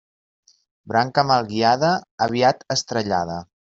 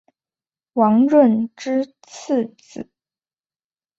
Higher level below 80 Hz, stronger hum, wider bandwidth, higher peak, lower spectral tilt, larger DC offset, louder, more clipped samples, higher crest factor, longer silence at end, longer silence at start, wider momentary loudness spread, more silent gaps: first, -60 dBFS vs -68 dBFS; neither; about the same, 7.8 kHz vs 7.8 kHz; about the same, -4 dBFS vs -2 dBFS; second, -4.5 dB/octave vs -7 dB/octave; neither; about the same, -20 LUFS vs -18 LUFS; neither; about the same, 18 dB vs 18 dB; second, 0.15 s vs 1.15 s; about the same, 0.85 s vs 0.75 s; second, 6 LU vs 22 LU; first, 2.11-2.18 s vs none